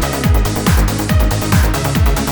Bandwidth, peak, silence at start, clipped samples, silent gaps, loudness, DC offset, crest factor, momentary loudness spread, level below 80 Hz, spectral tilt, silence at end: over 20 kHz; -2 dBFS; 0 s; under 0.1%; none; -15 LUFS; under 0.1%; 12 dB; 1 LU; -16 dBFS; -5 dB/octave; 0 s